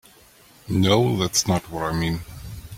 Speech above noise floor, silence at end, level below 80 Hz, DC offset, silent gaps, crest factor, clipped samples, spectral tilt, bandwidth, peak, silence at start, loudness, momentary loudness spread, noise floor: 30 dB; 0 s; -44 dBFS; under 0.1%; none; 20 dB; under 0.1%; -4.5 dB/octave; 16.5 kHz; -4 dBFS; 0.65 s; -22 LUFS; 14 LU; -52 dBFS